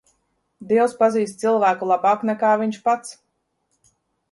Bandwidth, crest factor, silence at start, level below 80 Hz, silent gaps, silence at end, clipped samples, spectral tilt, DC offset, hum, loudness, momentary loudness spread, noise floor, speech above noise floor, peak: 11.5 kHz; 16 dB; 0.6 s; -70 dBFS; none; 1.2 s; under 0.1%; -5.5 dB/octave; under 0.1%; none; -20 LUFS; 4 LU; -72 dBFS; 52 dB; -4 dBFS